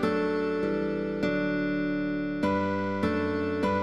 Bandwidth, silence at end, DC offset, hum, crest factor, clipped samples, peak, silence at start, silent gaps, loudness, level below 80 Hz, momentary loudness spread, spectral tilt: 11 kHz; 0 s; 0.3%; none; 14 dB; under 0.1%; -12 dBFS; 0 s; none; -28 LUFS; -56 dBFS; 2 LU; -7.5 dB/octave